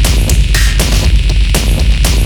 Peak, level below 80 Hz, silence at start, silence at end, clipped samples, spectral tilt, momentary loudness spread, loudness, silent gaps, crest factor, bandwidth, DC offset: 0 dBFS; -10 dBFS; 0 s; 0 s; under 0.1%; -4 dB/octave; 1 LU; -11 LUFS; none; 8 dB; 18 kHz; under 0.1%